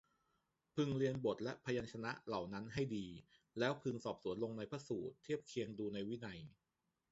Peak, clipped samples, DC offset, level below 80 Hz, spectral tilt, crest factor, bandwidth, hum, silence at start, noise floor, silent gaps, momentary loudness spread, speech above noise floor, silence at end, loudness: -22 dBFS; under 0.1%; under 0.1%; -72 dBFS; -5.5 dB/octave; 22 dB; 8 kHz; none; 0.75 s; -88 dBFS; none; 10 LU; 46 dB; 0.6 s; -44 LUFS